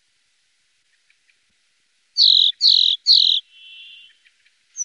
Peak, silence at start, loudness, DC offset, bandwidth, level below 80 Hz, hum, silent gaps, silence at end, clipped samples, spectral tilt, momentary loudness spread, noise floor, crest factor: -4 dBFS; 2.15 s; -13 LUFS; under 0.1%; 10.5 kHz; -88 dBFS; none; none; 0 s; under 0.1%; 7.5 dB/octave; 8 LU; -66 dBFS; 16 dB